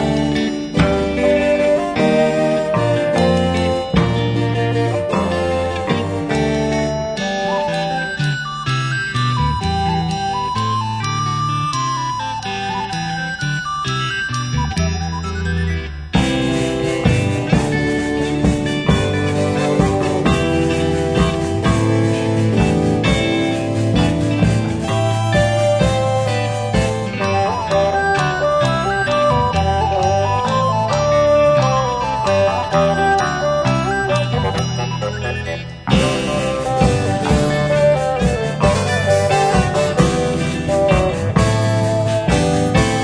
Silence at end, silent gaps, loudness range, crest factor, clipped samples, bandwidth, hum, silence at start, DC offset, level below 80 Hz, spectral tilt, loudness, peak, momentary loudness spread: 0 s; none; 4 LU; 16 dB; under 0.1%; 10.5 kHz; none; 0 s; under 0.1%; -32 dBFS; -6 dB/octave; -17 LUFS; 0 dBFS; 5 LU